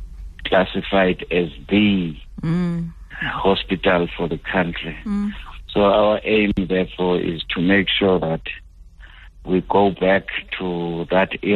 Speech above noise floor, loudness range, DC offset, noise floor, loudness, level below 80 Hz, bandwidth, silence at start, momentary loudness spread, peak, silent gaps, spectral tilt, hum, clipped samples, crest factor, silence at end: 23 dB; 3 LU; under 0.1%; -42 dBFS; -20 LUFS; -38 dBFS; 5.2 kHz; 0 s; 11 LU; -4 dBFS; none; -8 dB/octave; none; under 0.1%; 16 dB; 0 s